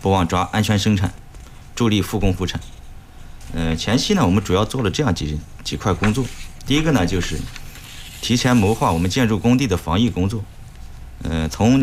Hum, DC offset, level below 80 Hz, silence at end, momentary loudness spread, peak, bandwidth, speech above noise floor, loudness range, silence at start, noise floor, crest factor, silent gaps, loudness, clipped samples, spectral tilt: none; under 0.1%; -34 dBFS; 0 s; 17 LU; -6 dBFS; 16 kHz; 20 dB; 3 LU; 0 s; -38 dBFS; 14 dB; none; -19 LUFS; under 0.1%; -5.5 dB/octave